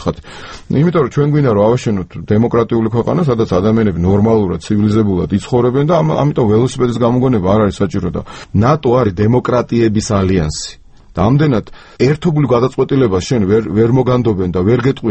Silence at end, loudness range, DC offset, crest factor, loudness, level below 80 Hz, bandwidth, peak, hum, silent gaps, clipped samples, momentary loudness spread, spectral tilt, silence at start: 0 s; 2 LU; under 0.1%; 12 dB; -13 LUFS; -36 dBFS; 8.8 kHz; 0 dBFS; none; none; under 0.1%; 7 LU; -7.5 dB/octave; 0 s